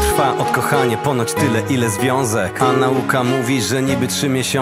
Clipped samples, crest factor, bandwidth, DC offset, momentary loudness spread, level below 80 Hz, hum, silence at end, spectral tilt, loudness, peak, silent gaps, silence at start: under 0.1%; 16 dB; 16 kHz; under 0.1%; 2 LU; -38 dBFS; none; 0 s; -4.5 dB/octave; -17 LUFS; 0 dBFS; none; 0 s